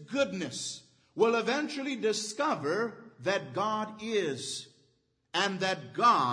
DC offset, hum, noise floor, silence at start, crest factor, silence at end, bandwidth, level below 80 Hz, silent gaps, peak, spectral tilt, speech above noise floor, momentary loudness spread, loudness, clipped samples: under 0.1%; none; -72 dBFS; 0 s; 20 dB; 0 s; 10.5 kHz; -78 dBFS; none; -12 dBFS; -3.5 dB/octave; 42 dB; 11 LU; -31 LUFS; under 0.1%